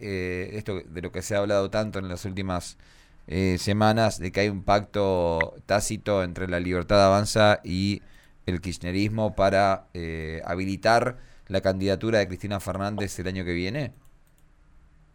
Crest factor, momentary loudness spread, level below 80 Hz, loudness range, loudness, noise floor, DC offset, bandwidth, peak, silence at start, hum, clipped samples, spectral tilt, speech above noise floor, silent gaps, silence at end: 18 dB; 12 LU; -46 dBFS; 5 LU; -26 LUFS; -56 dBFS; under 0.1%; 18 kHz; -8 dBFS; 0 s; none; under 0.1%; -5.5 dB/octave; 31 dB; none; 1.25 s